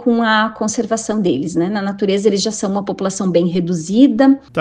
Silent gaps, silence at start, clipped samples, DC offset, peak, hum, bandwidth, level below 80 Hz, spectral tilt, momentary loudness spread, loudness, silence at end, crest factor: none; 0 s; under 0.1%; under 0.1%; 0 dBFS; none; 9.8 kHz; -54 dBFS; -5 dB/octave; 7 LU; -16 LUFS; 0 s; 16 dB